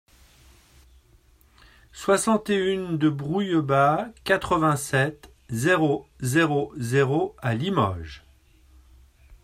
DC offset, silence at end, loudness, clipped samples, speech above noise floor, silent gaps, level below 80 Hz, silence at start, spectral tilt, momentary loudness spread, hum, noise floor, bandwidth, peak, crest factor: under 0.1%; 0.1 s; -24 LUFS; under 0.1%; 34 dB; none; -54 dBFS; 1.95 s; -5.5 dB/octave; 7 LU; none; -57 dBFS; 16 kHz; -6 dBFS; 20 dB